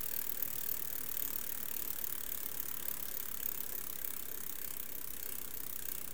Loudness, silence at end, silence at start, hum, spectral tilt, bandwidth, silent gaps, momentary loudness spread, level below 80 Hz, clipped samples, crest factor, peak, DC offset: -38 LUFS; 0 s; 0 s; none; -1 dB/octave; 19 kHz; none; 5 LU; -64 dBFS; under 0.1%; 24 dB; -16 dBFS; 0.7%